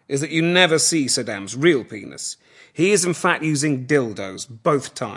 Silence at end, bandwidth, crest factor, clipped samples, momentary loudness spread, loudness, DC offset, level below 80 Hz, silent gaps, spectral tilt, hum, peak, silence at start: 0 s; 11.5 kHz; 20 dB; under 0.1%; 15 LU; -19 LUFS; under 0.1%; -72 dBFS; none; -3.5 dB/octave; none; 0 dBFS; 0.1 s